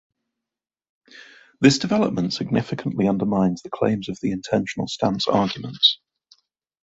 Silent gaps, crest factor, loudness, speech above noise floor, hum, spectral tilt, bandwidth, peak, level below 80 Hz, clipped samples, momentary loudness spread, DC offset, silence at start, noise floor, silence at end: none; 22 dB; -21 LUFS; 61 dB; none; -5 dB/octave; 8 kHz; -2 dBFS; -56 dBFS; under 0.1%; 9 LU; under 0.1%; 1.15 s; -82 dBFS; 0.9 s